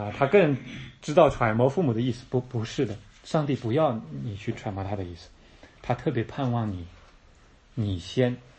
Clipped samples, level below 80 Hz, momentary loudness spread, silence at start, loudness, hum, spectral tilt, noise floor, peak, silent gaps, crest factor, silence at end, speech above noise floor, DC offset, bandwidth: under 0.1%; -52 dBFS; 18 LU; 0 s; -26 LUFS; none; -7 dB/octave; -55 dBFS; -6 dBFS; none; 22 dB; 0.2 s; 30 dB; under 0.1%; 8.6 kHz